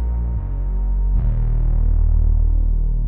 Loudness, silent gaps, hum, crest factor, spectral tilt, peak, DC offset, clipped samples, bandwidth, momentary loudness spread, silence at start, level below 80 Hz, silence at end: -21 LUFS; none; none; 8 dB; -12 dB/octave; -8 dBFS; under 0.1%; under 0.1%; 1.6 kHz; 5 LU; 0 s; -16 dBFS; 0 s